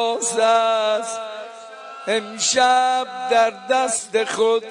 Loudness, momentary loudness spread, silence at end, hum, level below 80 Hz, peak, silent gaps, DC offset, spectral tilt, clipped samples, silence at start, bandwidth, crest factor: -19 LUFS; 16 LU; 0 s; none; -68 dBFS; -6 dBFS; none; under 0.1%; -0.5 dB/octave; under 0.1%; 0 s; 11 kHz; 14 dB